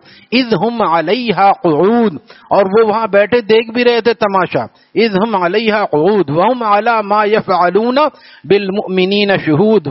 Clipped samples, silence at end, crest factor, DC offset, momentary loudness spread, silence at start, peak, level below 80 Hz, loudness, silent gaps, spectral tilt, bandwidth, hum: under 0.1%; 0 s; 12 dB; under 0.1%; 4 LU; 0.3 s; 0 dBFS; -56 dBFS; -12 LUFS; none; -4 dB/octave; 6 kHz; none